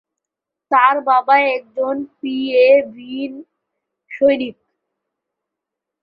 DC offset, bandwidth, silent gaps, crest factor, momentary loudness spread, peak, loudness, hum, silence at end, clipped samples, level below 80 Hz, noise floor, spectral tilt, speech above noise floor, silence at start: under 0.1%; 5.2 kHz; none; 16 dB; 15 LU; -2 dBFS; -16 LUFS; none; 1.5 s; under 0.1%; -68 dBFS; -84 dBFS; -6.5 dB/octave; 68 dB; 0.7 s